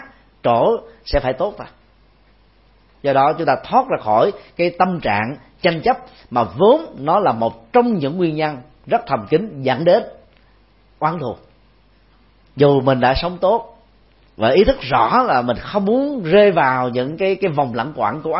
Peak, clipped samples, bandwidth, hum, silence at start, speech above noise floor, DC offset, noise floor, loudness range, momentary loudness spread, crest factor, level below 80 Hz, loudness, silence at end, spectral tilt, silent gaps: 0 dBFS; under 0.1%; 5.8 kHz; none; 0 s; 36 dB; under 0.1%; -53 dBFS; 5 LU; 9 LU; 18 dB; -40 dBFS; -17 LUFS; 0 s; -10.5 dB/octave; none